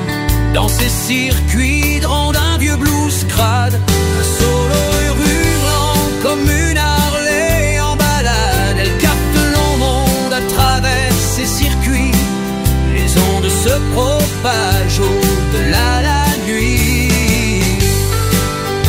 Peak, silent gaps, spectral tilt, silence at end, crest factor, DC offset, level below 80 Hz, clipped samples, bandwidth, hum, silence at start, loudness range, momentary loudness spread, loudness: 0 dBFS; none; -4.5 dB/octave; 0 s; 12 dB; 0.2%; -18 dBFS; under 0.1%; 16.5 kHz; none; 0 s; 1 LU; 2 LU; -13 LUFS